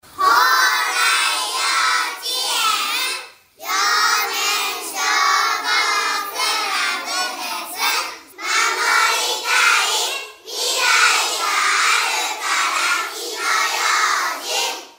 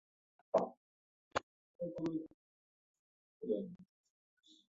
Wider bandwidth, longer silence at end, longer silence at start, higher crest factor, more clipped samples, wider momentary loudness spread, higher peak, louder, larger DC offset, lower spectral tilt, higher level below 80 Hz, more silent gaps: first, 16.5 kHz vs 7.4 kHz; second, 0.1 s vs 0.9 s; second, 0.1 s vs 0.55 s; second, 18 dB vs 26 dB; neither; second, 9 LU vs 13 LU; first, -2 dBFS vs -20 dBFS; first, -17 LUFS vs -42 LUFS; neither; second, 3 dB/octave vs -5.5 dB/octave; first, -72 dBFS vs -78 dBFS; second, none vs 0.77-1.31 s, 1.43-1.79 s, 2.34-3.40 s